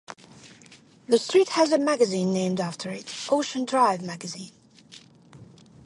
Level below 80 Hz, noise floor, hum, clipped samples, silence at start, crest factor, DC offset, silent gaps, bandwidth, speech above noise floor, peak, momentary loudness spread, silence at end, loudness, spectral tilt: -72 dBFS; -53 dBFS; none; under 0.1%; 0.1 s; 20 dB; under 0.1%; none; 11.5 kHz; 29 dB; -6 dBFS; 16 LU; 0.4 s; -24 LUFS; -4.5 dB/octave